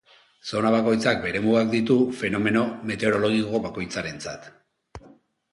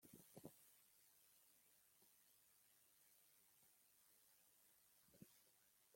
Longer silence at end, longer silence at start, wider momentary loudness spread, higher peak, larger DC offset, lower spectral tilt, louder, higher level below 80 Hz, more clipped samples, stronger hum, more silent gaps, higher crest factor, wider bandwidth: first, 0.55 s vs 0 s; first, 0.45 s vs 0 s; first, 11 LU vs 6 LU; first, -6 dBFS vs -44 dBFS; neither; first, -5.5 dB/octave vs -3.5 dB/octave; first, -23 LUFS vs -66 LUFS; first, -56 dBFS vs under -90 dBFS; neither; neither; neither; second, 18 dB vs 28 dB; second, 11.5 kHz vs 16.5 kHz